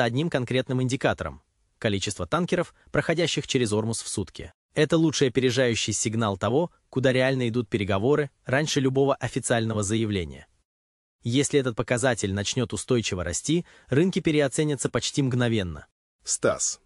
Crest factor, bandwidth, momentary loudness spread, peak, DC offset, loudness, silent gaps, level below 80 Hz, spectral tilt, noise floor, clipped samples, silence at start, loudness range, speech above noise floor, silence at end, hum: 18 dB; 12 kHz; 7 LU; -6 dBFS; under 0.1%; -25 LUFS; 4.54-4.69 s, 10.65-11.19 s, 15.92-16.19 s; -52 dBFS; -4.5 dB/octave; under -90 dBFS; under 0.1%; 0 s; 3 LU; over 65 dB; 0.1 s; none